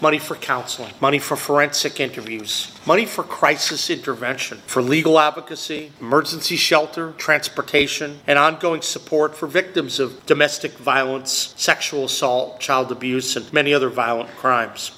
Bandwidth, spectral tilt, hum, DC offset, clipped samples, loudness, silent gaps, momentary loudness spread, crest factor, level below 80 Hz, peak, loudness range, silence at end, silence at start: 16.5 kHz; -3 dB/octave; none; under 0.1%; under 0.1%; -19 LUFS; none; 8 LU; 20 dB; -62 dBFS; 0 dBFS; 2 LU; 0 s; 0 s